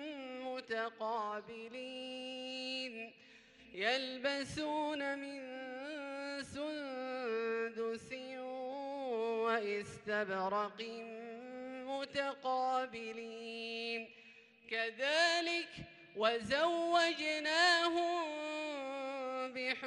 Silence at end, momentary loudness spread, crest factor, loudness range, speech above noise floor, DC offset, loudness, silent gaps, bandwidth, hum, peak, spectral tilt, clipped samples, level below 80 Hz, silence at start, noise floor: 0 s; 14 LU; 22 dB; 8 LU; 24 dB; under 0.1%; -38 LUFS; none; 11.5 kHz; none; -18 dBFS; -3 dB/octave; under 0.1%; -76 dBFS; 0 s; -61 dBFS